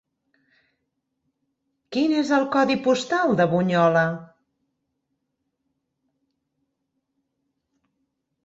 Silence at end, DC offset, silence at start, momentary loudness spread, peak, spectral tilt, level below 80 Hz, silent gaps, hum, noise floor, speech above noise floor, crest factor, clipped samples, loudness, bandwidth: 4.2 s; under 0.1%; 1.9 s; 7 LU; -6 dBFS; -6 dB/octave; -68 dBFS; none; none; -78 dBFS; 57 dB; 20 dB; under 0.1%; -21 LUFS; 8 kHz